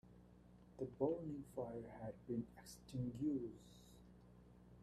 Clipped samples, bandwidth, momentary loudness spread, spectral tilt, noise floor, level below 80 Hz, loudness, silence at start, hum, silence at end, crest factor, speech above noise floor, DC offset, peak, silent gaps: under 0.1%; 14 kHz; 23 LU; -8 dB/octave; -65 dBFS; -70 dBFS; -47 LUFS; 0.05 s; 60 Hz at -65 dBFS; 0 s; 20 dB; 19 dB; under 0.1%; -28 dBFS; none